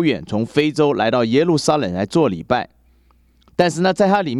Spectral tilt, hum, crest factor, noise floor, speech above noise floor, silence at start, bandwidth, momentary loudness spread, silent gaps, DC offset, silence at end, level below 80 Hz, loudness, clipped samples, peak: -5.5 dB/octave; none; 16 dB; -55 dBFS; 38 dB; 0 s; 12.5 kHz; 6 LU; none; under 0.1%; 0 s; -52 dBFS; -18 LUFS; under 0.1%; 0 dBFS